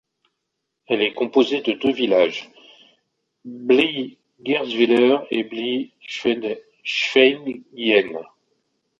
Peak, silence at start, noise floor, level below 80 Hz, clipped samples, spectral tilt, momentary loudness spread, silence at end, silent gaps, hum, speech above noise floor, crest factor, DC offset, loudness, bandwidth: -2 dBFS; 0.9 s; -78 dBFS; -66 dBFS; under 0.1%; -4.5 dB/octave; 15 LU; 0.75 s; none; none; 58 dB; 18 dB; under 0.1%; -20 LUFS; 7.6 kHz